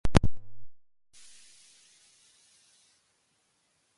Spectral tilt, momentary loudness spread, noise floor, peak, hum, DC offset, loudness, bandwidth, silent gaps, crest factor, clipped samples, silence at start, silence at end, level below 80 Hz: -6 dB/octave; 30 LU; -73 dBFS; -2 dBFS; none; under 0.1%; -29 LUFS; 11.5 kHz; none; 28 dB; under 0.1%; 0.05 s; 3.2 s; -42 dBFS